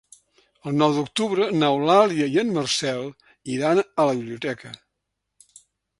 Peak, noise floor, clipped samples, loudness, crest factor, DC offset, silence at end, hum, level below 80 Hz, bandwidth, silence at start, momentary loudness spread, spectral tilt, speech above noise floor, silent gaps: -2 dBFS; -80 dBFS; under 0.1%; -22 LUFS; 20 dB; under 0.1%; 1.25 s; none; -66 dBFS; 11.5 kHz; 0.65 s; 16 LU; -5 dB/octave; 58 dB; none